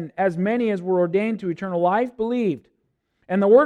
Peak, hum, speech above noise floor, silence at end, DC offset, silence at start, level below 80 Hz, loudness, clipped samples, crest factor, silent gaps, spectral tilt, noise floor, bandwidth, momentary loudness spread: -4 dBFS; none; 51 dB; 0 s; under 0.1%; 0 s; -64 dBFS; -22 LUFS; under 0.1%; 18 dB; none; -8.5 dB/octave; -71 dBFS; 9.6 kHz; 6 LU